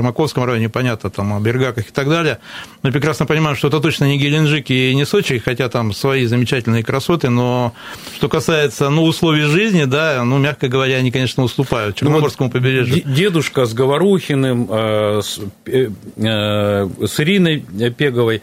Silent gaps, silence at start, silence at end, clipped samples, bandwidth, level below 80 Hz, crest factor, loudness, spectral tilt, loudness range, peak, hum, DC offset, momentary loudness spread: none; 0 s; 0 s; under 0.1%; 16 kHz; -48 dBFS; 16 dB; -16 LUFS; -6 dB/octave; 2 LU; 0 dBFS; none; under 0.1%; 6 LU